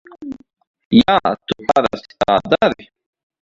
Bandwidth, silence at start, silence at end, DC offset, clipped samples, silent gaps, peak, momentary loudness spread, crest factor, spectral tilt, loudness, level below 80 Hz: 7.6 kHz; 0.2 s; 0.6 s; under 0.1%; under 0.1%; 0.67-0.74 s, 0.85-0.91 s; 0 dBFS; 20 LU; 18 dB; -6 dB/octave; -16 LUFS; -48 dBFS